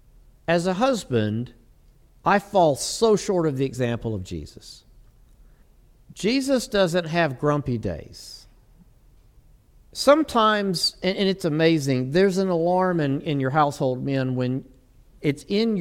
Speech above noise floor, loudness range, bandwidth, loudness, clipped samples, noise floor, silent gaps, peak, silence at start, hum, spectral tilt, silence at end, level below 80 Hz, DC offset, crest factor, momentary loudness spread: 32 dB; 6 LU; 16.5 kHz; -22 LUFS; under 0.1%; -54 dBFS; none; -2 dBFS; 0.5 s; none; -5.5 dB/octave; 0 s; -50 dBFS; under 0.1%; 20 dB; 12 LU